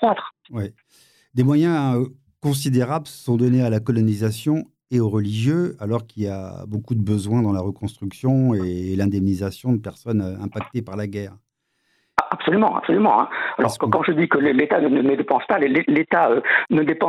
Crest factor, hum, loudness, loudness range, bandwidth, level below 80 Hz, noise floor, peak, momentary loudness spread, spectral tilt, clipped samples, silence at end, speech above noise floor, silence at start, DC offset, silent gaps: 20 dB; none; -21 LUFS; 6 LU; 15 kHz; -62 dBFS; -69 dBFS; 0 dBFS; 11 LU; -7 dB/octave; under 0.1%; 0 s; 49 dB; 0 s; under 0.1%; none